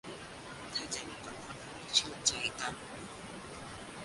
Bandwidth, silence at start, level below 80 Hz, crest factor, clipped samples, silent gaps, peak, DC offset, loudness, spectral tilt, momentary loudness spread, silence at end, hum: 11.5 kHz; 0.05 s; -62 dBFS; 26 dB; under 0.1%; none; -14 dBFS; under 0.1%; -37 LUFS; -1 dB/octave; 15 LU; 0 s; none